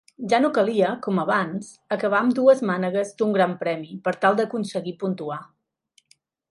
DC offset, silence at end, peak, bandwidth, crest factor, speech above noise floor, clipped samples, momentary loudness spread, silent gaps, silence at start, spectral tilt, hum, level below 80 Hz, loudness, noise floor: under 0.1%; 1.05 s; -4 dBFS; 11.5 kHz; 18 dB; 42 dB; under 0.1%; 12 LU; none; 0.2 s; -6 dB/octave; none; -72 dBFS; -23 LUFS; -65 dBFS